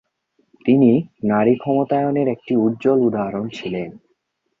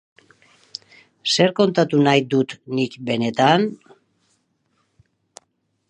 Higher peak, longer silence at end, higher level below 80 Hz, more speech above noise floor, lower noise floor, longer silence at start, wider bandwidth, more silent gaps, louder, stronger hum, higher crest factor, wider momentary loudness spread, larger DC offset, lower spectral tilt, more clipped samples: about the same, -2 dBFS vs -2 dBFS; second, 0.65 s vs 2.15 s; first, -60 dBFS vs -70 dBFS; about the same, 51 dB vs 51 dB; about the same, -69 dBFS vs -70 dBFS; second, 0.65 s vs 1.25 s; second, 7.2 kHz vs 10.5 kHz; neither; about the same, -19 LUFS vs -19 LUFS; neither; about the same, 16 dB vs 20 dB; second, 12 LU vs 20 LU; neither; first, -9 dB/octave vs -5 dB/octave; neither